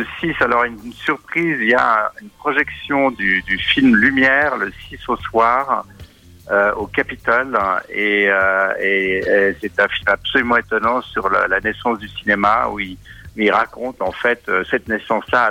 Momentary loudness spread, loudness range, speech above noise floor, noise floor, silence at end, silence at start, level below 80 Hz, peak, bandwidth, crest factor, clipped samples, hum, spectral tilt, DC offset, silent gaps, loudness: 9 LU; 3 LU; 24 dB; -41 dBFS; 0 s; 0 s; -44 dBFS; 0 dBFS; 16 kHz; 18 dB; under 0.1%; none; -5.5 dB/octave; under 0.1%; none; -17 LUFS